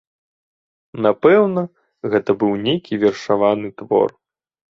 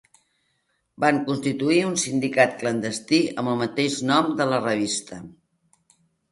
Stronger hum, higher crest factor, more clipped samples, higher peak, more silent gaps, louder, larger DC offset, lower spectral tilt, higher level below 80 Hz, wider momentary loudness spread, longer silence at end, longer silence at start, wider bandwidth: neither; about the same, 16 dB vs 20 dB; neither; about the same, -2 dBFS vs -4 dBFS; neither; first, -18 LUFS vs -23 LUFS; neither; first, -7 dB/octave vs -4 dB/octave; first, -60 dBFS vs -66 dBFS; first, 11 LU vs 6 LU; second, 0.6 s vs 1 s; about the same, 0.95 s vs 1 s; second, 7.2 kHz vs 11.5 kHz